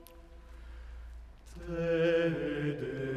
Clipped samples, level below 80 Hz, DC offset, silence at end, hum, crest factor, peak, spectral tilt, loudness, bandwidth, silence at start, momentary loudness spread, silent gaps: under 0.1%; -50 dBFS; under 0.1%; 0 s; none; 16 dB; -18 dBFS; -7.5 dB/octave; -32 LUFS; 13.5 kHz; 0 s; 24 LU; none